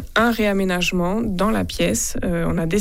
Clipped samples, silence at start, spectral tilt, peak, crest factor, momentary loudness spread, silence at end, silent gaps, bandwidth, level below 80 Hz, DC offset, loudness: under 0.1%; 0 s; -4.5 dB/octave; -6 dBFS; 14 dB; 4 LU; 0 s; none; 16.5 kHz; -32 dBFS; under 0.1%; -20 LUFS